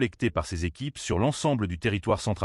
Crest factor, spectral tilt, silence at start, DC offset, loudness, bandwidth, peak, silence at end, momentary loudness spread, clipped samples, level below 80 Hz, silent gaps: 16 dB; -5.5 dB/octave; 0 s; under 0.1%; -28 LUFS; 12 kHz; -12 dBFS; 0 s; 7 LU; under 0.1%; -44 dBFS; none